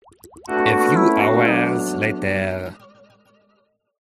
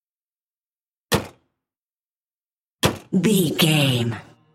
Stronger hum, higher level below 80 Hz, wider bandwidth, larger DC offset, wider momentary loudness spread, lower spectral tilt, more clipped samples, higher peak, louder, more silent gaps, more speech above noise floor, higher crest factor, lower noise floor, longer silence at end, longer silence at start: neither; second, -58 dBFS vs -52 dBFS; about the same, 15.5 kHz vs 16.5 kHz; neither; about the same, 12 LU vs 10 LU; first, -6 dB/octave vs -4.5 dB/octave; neither; about the same, -2 dBFS vs -4 dBFS; about the same, -18 LUFS vs -20 LUFS; second, none vs 1.79-2.41 s, 2.52-2.79 s; second, 44 dB vs over 71 dB; about the same, 18 dB vs 20 dB; second, -64 dBFS vs under -90 dBFS; first, 1.3 s vs 0.3 s; second, 0.25 s vs 1.1 s